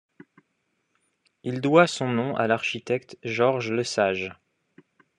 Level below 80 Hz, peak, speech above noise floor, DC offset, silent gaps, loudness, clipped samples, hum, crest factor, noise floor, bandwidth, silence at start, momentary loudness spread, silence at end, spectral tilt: -72 dBFS; -4 dBFS; 51 dB; under 0.1%; none; -24 LUFS; under 0.1%; none; 22 dB; -74 dBFS; 10.5 kHz; 1.45 s; 12 LU; 0.85 s; -5 dB/octave